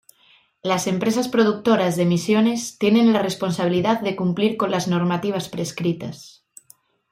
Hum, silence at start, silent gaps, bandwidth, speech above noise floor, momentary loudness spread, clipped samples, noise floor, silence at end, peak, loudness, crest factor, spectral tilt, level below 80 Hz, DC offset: none; 0.65 s; none; 16 kHz; 37 dB; 8 LU; under 0.1%; -57 dBFS; 0.8 s; -4 dBFS; -21 LUFS; 16 dB; -5.5 dB/octave; -62 dBFS; under 0.1%